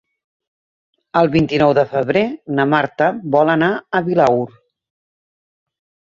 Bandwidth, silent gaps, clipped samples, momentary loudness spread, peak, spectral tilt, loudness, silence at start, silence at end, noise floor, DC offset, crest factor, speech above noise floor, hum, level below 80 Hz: 7.4 kHz; none; under 0.1%; 6 LU; -2 dBFS; -7.5 dB/octave; -16 LUFS; 1.15 s; 1.65 s; under -90 dBFS; under 0.1%; 16 dB; over 75 dB; none; -52 dBFS